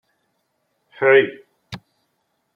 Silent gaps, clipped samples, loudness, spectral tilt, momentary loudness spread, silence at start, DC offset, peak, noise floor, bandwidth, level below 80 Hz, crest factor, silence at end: none; under 0.1%; -17 LUFS; -6.5 dB/octave; 24 LU; 1 s; under 0.1%; -2 dBFS; -71 dBFS; 6 kHz; -64 dBFS; 20 dB; 0.8 s